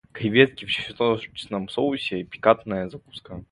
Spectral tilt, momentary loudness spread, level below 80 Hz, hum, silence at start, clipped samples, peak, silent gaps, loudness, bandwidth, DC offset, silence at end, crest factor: -6.5 dB/octave; 16 LU; -56 dBFS; none; 0.15 s; under 0.1%; 0 dBFS; none; -23 LUFS; 11 kHz; under 0.1%; 0.1 s; 24 dB